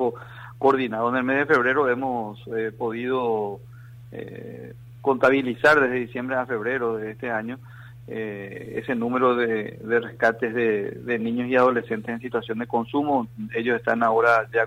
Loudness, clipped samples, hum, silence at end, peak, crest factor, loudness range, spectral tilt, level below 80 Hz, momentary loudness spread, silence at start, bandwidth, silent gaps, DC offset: -23 LUFS; under 0.1%; none; 0 s; -6 dBFS; 18 dB; 4 LU; -7 dB/octave; -60 dBFS; 17 LU; 0 s; 15.5 kHz; none; under 0.1%